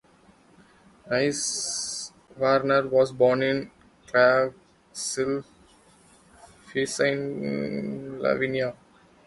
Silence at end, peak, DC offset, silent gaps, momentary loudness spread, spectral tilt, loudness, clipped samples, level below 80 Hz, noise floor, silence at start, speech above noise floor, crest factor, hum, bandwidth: 0.5 s; -6 dBFS; under 0.1%; none; 12 LU; -3.5 dB/octave; -25 LUFS; under 0.1%; -62 dBFS; -57 dBFS; 1.05 s; 33 dB; 20 dB; none; 11.5 kHz